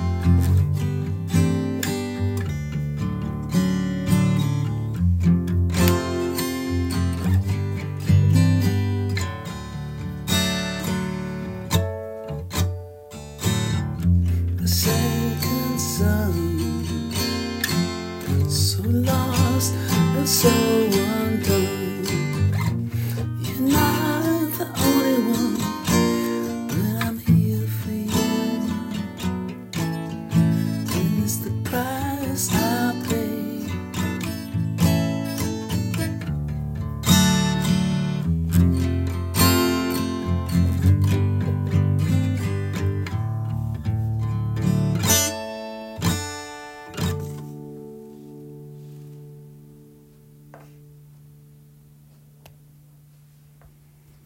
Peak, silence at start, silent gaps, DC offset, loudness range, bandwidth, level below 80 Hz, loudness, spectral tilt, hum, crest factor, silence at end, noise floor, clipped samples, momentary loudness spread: -2 dBFS; 0 s; none; under 0.1%; 5 LU; 16.5 kHz; -44 dBFS; -22 LUFS; -5.5 dB/octave; none; 20 dB; 0.6 s; -51 dBFS; under 0.1%; 11 LU